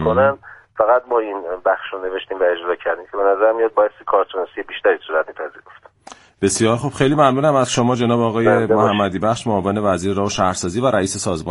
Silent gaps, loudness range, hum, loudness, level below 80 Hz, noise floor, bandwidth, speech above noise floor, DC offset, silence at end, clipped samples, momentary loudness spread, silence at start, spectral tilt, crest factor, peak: none; 4 LU; none; -18 LUFS; -50 dBFS; -43 dBFS; 11.5 kHz; 26 dB; under 0.1%; 0 s; under 0.1%; 9 LU; 0 s; -5 dB/octave; 18 dB; 0 dBFS